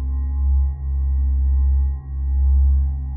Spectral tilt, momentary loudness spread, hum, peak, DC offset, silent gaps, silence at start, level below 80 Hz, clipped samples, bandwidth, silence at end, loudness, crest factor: -14.5 dB/octave; 6 LU; none; -10 dBFS; under 0.1%; none; 0 s; -18 dBFS; under 0.1%; 1.2 kHz; 0 s; -21 LUFS; 8 dB